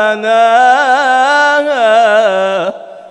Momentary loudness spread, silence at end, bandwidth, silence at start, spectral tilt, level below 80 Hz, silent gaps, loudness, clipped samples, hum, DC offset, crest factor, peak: 8 LU; 0.05 s; 11 kHz; 0 s; -2.5 dB/octave; -68 dBFS; none; -9 LUFS; 0.3%; none; under 0.1%; 10 dB; 0 dBFS